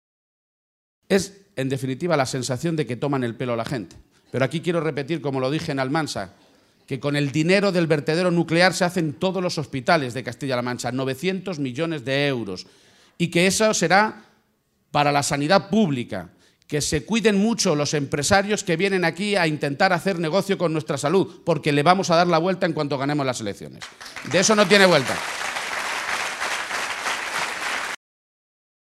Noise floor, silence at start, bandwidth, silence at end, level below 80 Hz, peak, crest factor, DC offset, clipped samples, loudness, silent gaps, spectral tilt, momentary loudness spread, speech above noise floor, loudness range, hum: -67 dBFS; 1.1 s; 15 kHz; 1 s; -56 dBFS; 0 dBFS; 22 dB; under 0.1%; under 0.1%; -22 LUFS; none; -4.5 dB/octave; 11 LU; 46 dB; 5 LU; none